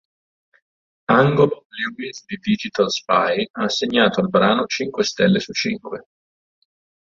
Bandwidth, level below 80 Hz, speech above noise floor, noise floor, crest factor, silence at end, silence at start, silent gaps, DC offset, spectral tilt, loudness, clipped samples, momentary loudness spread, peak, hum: 7.6 kHz; -58 dBFS; over 71 dB; under -90 dBFS; 20 dB; 1.1 s; 1.1 s; 1.65-1.70 s, 3.50-3.54 s; under 0.1%; -5 dB/octave; -19 LUFS; under 0.1%; 13 LU; -2 dBFS; none